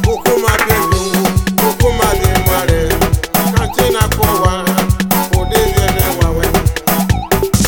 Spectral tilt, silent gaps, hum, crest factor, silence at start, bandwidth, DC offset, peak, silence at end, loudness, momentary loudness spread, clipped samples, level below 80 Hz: -5 dB/octave; none; none; 12 dB; 0 s; 19.5 kHz; under 0.1%; 0 dBFS; 0 s; -13 LUFS; 2 LU; under 0.1%; -20 dBFS